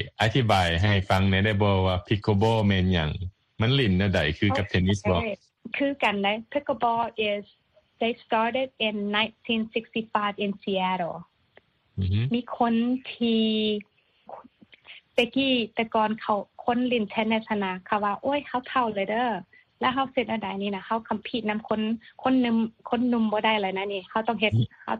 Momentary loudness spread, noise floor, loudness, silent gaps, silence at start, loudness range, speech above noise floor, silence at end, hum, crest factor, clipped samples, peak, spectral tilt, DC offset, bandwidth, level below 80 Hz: 8 LU; -61 dBFS; -26 LUFS; none; 0 s; 4 LU; 36 dB; 0 s; none; 18 dB; under 0.1%; -8 dBFS; -6.5 dB/octave; under 0.1%; 11 kHz; -50 dBFS